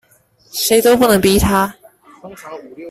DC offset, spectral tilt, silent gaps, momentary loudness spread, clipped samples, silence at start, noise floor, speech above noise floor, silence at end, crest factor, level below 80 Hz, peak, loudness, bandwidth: under 0.1%; -4 dB/octave; none; 22 LU; under 0.1%; 0.55 s; -53 dBFS; 39 dB; 0 s; 16 dB; -34 dBFS; 0 dBFS; -13 LUFS; 16 kHz